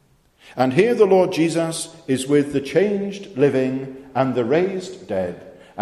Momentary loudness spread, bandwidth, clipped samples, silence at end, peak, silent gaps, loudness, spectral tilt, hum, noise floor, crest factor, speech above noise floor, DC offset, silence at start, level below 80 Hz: 14 LU; 13 kHz; under 0.1%; 0 s; -2 dBFS; none; -20 LUFS; -6 dB/octave; none; -52 dBFS; 18 dB; 33 dB; under 0.1%; 0.45 s; -58 dBFS